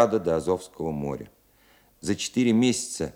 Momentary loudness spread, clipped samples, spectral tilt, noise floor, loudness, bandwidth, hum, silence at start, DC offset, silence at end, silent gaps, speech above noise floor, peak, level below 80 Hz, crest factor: 12 LU; under 0.1%; -5 dB/octave; -60 dBFS; -26 LUFS; 16 kHz; none; 0 s; under 0.1%; 0.05 s; none; 34 dB; -4 dBFS; -56 dBFS; 22 dB